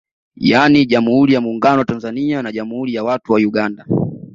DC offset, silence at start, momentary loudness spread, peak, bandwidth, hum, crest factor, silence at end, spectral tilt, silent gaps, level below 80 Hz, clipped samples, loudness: under 0.1%; 0.4 s; 10 LU; 0 dBFS; 7.6 kHz; none; 14 dB; 0.1 s; -7 dB/octave; none; -52 dBFS; under 0.1%; -15 LUFS